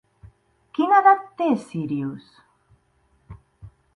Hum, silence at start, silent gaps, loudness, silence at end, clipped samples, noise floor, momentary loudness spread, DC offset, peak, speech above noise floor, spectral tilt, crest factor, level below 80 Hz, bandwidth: none; 0.8 s; none; -21 LUFS; 0.25 s; under 0.1%; -64 dBFS; 17 LU; under 0.1%; -4 dBFS; 44 dB; -7 dB/octave; 20 dB; -58 dBFS; 10.5 kHz